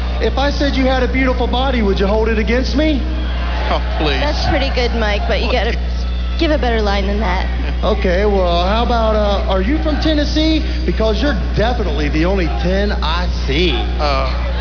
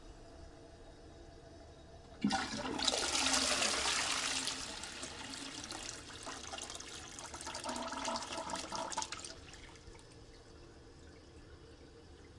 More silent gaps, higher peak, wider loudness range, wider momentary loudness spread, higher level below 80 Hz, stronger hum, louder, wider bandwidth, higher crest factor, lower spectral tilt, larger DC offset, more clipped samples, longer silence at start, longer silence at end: neither; first, -2 dBFS vs -14 dBFS; second, 2 LU vs 12 LU; second, 4 LU vs 25 LU; first, -18 dBFS vs -60 dBFS; first, 60 Hz at -20 dBFS vs none; first, -16 LUFS vs -37 LUFS; second, 5.4 kHz vs 11.5 kHz; second, 12 dB vs 28 dB; first, -6.5 dB/octave vs -1.5 dB/octave; first, 0.8% vs under 0.1%; neither; about the same, 0 s vs 0 s; about the same, 0 s vs 0 s